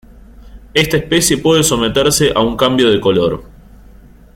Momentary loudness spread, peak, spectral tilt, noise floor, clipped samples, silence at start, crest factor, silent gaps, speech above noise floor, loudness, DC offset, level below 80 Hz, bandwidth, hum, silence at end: 4 LU; 0 dBFS; -3.5 dB/octave; -40 dBFS; under 0.1%; 0.4 s; 14 dB; none; 27 dB; -13 LUFS; under 0.1%; -36 dBFS; 16.5 kHz; none; 0.9 s